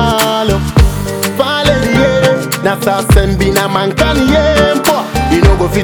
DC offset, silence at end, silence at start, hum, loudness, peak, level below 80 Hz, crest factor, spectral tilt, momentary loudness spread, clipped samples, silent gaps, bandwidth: under 0.1%; 0 s; 0 s; none; -11 LUFS; 0 dBFS; -18 dBFS; 10 dB; -5 dB/octave; 4 LU; 0.4%; none; over 20 kHz